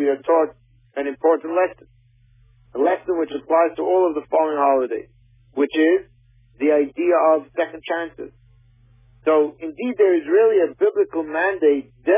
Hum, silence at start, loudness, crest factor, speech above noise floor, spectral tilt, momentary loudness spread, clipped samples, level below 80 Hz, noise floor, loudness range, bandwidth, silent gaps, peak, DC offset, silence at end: none; 0 s; -20 LUFS; 14 dB; 36 dB; -9 dB/octave; 10 LU; under 0.1%; -60 dBFS; -55 dBFS; 3 LU; 3.7 kHz; none; -6 dBFS; under 0.1%; 0 s